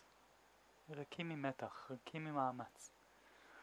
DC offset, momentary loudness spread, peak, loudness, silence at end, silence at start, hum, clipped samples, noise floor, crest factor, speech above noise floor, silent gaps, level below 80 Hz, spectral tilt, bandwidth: under 0.1%; 24 LU; -26 dBFS; -46 LUFS; 0 s; 0 s; none; under 0.1%; -70 dBFS; 22 dB; 24 dB; none; -84 dBFS; -5.5 dB/octave; 19.5 kHz